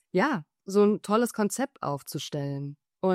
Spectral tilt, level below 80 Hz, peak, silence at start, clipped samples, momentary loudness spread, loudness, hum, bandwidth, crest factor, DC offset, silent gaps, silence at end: -5.5 dB/octave; -72 dBFS; -10 dBFS; 0.15 s; under 0.1%; 11 LU; -28 LUFS; none; 16 kHz; 16 dB; under 0.1%; none; 0 s